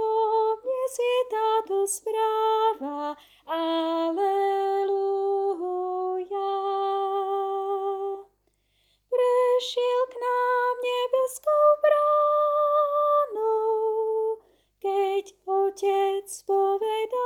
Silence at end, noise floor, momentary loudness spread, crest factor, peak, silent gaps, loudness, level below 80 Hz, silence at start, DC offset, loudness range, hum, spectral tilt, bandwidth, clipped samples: 0 s; -70 dBFS; 8 LU; 14 dB; -10 dBFS; none; -25 LUFS; -74 dBFS; 0 s; under 0.1%; 5 LU; 50 Hz at -75 dBFS; -1.5 dB/octave; 17 kHz; under 0.1%